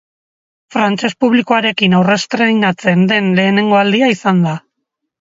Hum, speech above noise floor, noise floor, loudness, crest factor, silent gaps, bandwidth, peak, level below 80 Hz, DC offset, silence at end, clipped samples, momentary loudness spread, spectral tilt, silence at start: none; 62 dB; -74 dBFS; -13 LUFS; 14 dB; none; 7.8 kHz; 0 dBFS; -58 dBFS; under 0.1%; 0.65 s; under 0.1%; 4 LU; -6 dB/octave; 0.7 s